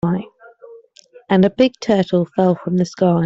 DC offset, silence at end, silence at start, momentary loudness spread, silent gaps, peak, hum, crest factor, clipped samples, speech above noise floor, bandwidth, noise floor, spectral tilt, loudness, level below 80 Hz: under 0.1%; 0 s; 0.05 s; 5 LU; none; -2 dBFS; none; 16 dB; under 0.1%; 32 dB; 7.6 kHz; -47 dBFS; -7.5 dB/octave; -17 LUFS; -54 dBFS